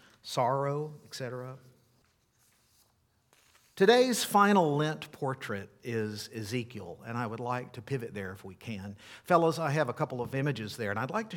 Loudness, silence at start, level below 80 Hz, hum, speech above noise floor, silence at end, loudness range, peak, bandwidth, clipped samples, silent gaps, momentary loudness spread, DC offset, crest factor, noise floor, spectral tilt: -31 LUFS; 0.25 s; -74 dBFS; none; 40 dB; 0 s; 9 LU; -10 dBFS; 18 kHz; under 0.1%; none; 18 LU; under 0.1%; 22 dB; -71 dBFS; -5 dB/octave